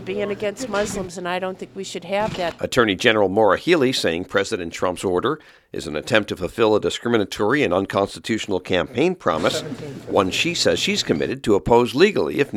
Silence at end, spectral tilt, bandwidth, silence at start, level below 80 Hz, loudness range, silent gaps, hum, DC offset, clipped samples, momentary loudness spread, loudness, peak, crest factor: 0 s; -4.5 dB/octave; 16 kHz; 0 s; -48 dBFS; 3 LU; none; none; under 0.1%; under 0.1%; 10 LU; -20 LUFS; 0 dBFS; 20 dB